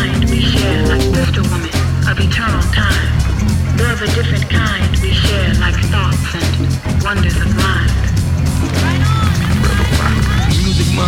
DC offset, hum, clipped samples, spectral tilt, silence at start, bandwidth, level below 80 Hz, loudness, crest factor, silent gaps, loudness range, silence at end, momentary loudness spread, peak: under 0.1%; none; under 0.1%; -5.5 dB/octave; 0 s; 16 kHz; -20 dBFS; -14 LUFS; 12 dB; none; 1 LU; 0 s; 3 LU; -2 dBFS